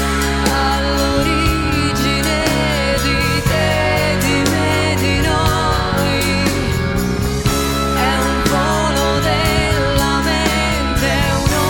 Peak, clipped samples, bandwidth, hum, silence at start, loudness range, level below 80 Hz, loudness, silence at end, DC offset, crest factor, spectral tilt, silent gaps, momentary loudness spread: -2 dBFS; under 0.1%; 19 kHz; none; 0 s; 1 LU; -24 dBFS; -15 LUFS; 0 s; under 0.1%; 14 dB; -4.5 dB/octave; none; 2 LU